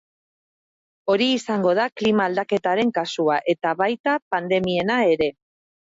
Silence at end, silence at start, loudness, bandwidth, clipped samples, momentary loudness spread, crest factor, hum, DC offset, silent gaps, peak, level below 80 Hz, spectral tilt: 0.65 s; 1.05 s; -21 LUFS; 8 kHz; under 0.1%; 4 LU; 14 dB; none; under 0.1%; 4.00-4.04 s, 4.22-4.31 s; -8 dBFS; -60 dBFS; -5.5 dB/octave